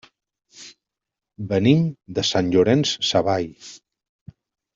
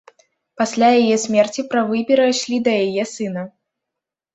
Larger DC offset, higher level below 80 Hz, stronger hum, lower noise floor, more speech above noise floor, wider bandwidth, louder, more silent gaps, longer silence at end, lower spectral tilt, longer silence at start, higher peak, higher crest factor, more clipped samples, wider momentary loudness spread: neither; first, -58 dBFS vs -64 dBFS; neither; about the same, -86 dBFS vs -84 dBFS; about the same, 66 dB vs 67 dB; about the same, 7.6 kHz vs 8.2 kHz; about the same, -20 LUFS vs -18 LUFS; neither; first, 1 s vs 0.85 s; first, -5.5 dB/octave vs -4 dB/octave; about the same, 0.6 s vs 0.6 s; about the same, -4 dBFS vs -2 dBFS; about the same, 18 dB vs 16 dB; neither; first, 24 LU vs 11 LU